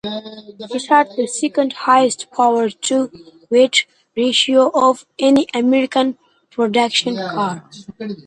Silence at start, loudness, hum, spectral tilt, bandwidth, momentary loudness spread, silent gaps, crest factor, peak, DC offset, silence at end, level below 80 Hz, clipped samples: 0.05 s; -16 LUFS; none; -3 dB/octave; 11 kHz; 15 LU; none; 16 dB; 0 dBFS; under 0.1%; 0.05 s; -64 dBFS; under 0.1%